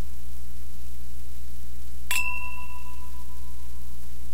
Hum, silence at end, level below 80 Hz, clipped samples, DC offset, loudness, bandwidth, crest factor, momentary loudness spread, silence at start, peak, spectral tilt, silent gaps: none; 0 s; -40 dBFS; under 0.1%; 10%; -36 LUFS; 16 kHz; 24 dB; 16 LU; 0 s; -8 dBFS; -2.5 dB/octave; none